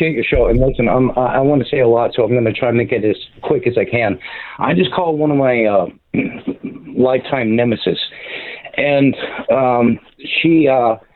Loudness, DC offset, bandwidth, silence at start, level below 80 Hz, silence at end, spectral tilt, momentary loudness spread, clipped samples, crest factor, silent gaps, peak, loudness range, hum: -15 LUFS; under 0.1%; 4.4 kHz; 0 s; -34 dBFS; 0.15 s; -10 dB/octave; 10 LU; under 0.1%; 12 dB; none; -2 dBFS; 3 LU; none